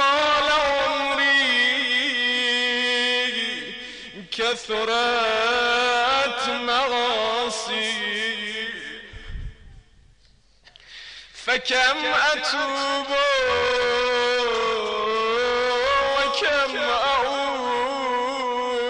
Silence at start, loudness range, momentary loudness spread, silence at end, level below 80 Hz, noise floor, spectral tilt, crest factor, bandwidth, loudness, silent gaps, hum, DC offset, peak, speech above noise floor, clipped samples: 0 s; 7 LU; 12 LU; 0 s; -50 dBFS; -58 dBFS; -1.5 dB/octave; 12 dB; 10.5 kHz; -21 LUFS; none; none; under 0.1%; -10 dBFS; 35 dB; under 0.1%